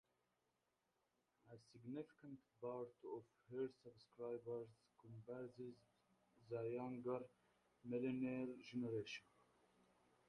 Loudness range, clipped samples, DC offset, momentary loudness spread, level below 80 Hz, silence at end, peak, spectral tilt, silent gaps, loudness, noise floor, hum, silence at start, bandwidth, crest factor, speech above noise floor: 6 LU; under 0.1%; under 0.1%; 16 LU; -88 dBFS; 1.05 s; -34 dBFS; -7 dB/octave; none; -51 LUFS; -88 dBFS; none; 1.45 s; 10.5 kHz; 18 dB; 38 dB